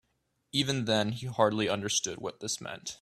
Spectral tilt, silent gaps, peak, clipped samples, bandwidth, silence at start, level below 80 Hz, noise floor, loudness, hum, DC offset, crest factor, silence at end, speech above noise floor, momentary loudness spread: -3.5 dB/octave; none; -10 dBFS; under 0.1%; 15 kHz; 0.55 s; -66 dBFS; -77 dBFS; -30 LUFS; none; under 0.1%; 22 dB; 0.05 s; 46 dB; 8 LU